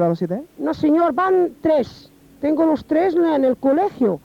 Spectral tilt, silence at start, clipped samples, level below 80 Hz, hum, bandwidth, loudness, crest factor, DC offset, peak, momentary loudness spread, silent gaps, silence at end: -8.5 dB/octave; 0 s; under 0.1%; -54 dBFS; none; 7.2 kHz; -19 LUFS; 12 dB; under 0.1%; -8 dBFS; 9 LU; none; 0.05 s